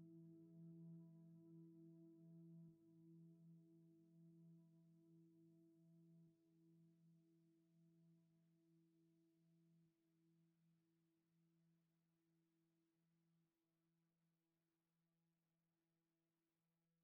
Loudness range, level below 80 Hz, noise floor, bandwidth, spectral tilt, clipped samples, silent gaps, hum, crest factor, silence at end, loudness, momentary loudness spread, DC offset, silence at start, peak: 4 LU; under -90 dBFS; under -90 dBFS; 1.3 kHz; -12.5 dB/octave; under 0.1%; none; none; 16 dB; 0 s; -66 LUFS; 6 LU; under 0.1%; 0 s; -56 dBFS